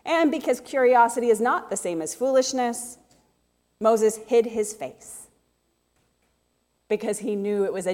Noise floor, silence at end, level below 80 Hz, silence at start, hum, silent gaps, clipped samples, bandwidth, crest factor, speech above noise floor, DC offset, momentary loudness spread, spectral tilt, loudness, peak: -71 dBFS; 0 s; -68 dBFS; 0.05 s; none; none; under 0.1%; 16.5 kHz; 18 dB; 48 dB; under 0.1%; 15 LU; -3.5 dB/octave; -23 LUFS; -6 dBFS